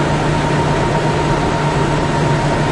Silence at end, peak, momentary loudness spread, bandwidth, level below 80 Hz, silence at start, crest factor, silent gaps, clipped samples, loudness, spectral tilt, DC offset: 0 s; -4 dBFS; 1 LU; 11 kHz; -28 dBFS; 0 s; 10 dB; none; under 0.1%; -16 LUFS; -6 dB/octave; under 0.1%